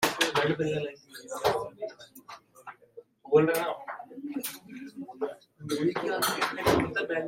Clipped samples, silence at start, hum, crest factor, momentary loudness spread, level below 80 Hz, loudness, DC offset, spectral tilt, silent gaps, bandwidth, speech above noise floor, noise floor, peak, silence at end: under 0.1%; 0 s; none; 20 dB; 21 LU; -60 dBFS; -29 LUFS; under 0.1%; -4 dB/octave; none; 16.5 kHz; 25 dB; -53 dBFS; -10 dBFS; 0 s